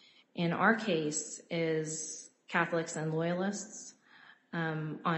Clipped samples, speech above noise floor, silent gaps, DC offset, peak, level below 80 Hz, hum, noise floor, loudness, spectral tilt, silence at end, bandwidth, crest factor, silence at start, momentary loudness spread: under 0.1%; 27 dB; none; under 0.1%; -12 dBFS; -80 dBFS; none; -60 dBFS; -33 LUFS; -4.5 dB/octave; 0 s; 8.2 kHz; 22 dB; 0.35 s; 15 LU